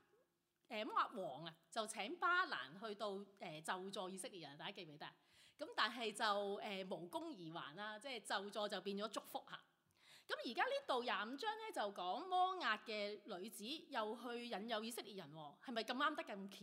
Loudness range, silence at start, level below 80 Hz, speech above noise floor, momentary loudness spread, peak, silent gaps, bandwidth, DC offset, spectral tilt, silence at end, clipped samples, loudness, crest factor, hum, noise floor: 5 LU; 0.7 s; under -90 dBFS; 37 dB; 12 LU; -24 dBFS; none; 16 kHz; under 0.1%; -3 dB/octave; 0 s; under 0.1%; -45 LUFS; 22 dB; none; -83 dBFS